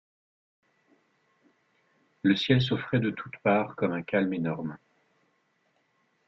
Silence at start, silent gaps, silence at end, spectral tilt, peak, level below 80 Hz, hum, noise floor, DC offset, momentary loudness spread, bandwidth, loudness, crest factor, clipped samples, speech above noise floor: 2.25 s; none; 1.5 s; -7.5 dB/octave; -10 dBFS; -64 dBFS; none; -72 dBFS; under 0.1%; 9 LU; 7.2 kHz; -28 LUFS; 22 dB; under 0.1%; 45 dB